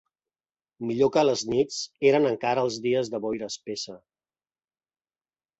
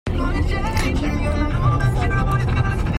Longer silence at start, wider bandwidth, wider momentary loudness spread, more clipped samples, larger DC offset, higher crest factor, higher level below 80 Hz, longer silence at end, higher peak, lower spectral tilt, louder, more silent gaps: first, 0.8 s vs 0.05 s; second, 8.2 kHz vs 16 kHz; first, 12 LU vs 3 LU; neither; neither; first, 20 dB vs 14 dB; second, -66 dBFS vs -24 dBFS; first, 1.65 s vs 0 s; about the same, -8 dBFS vs -6 dBFS; second, -4.5 dB/octave vs -7 dB/octave; second, -25 LUFS vs -21 LUFS; neither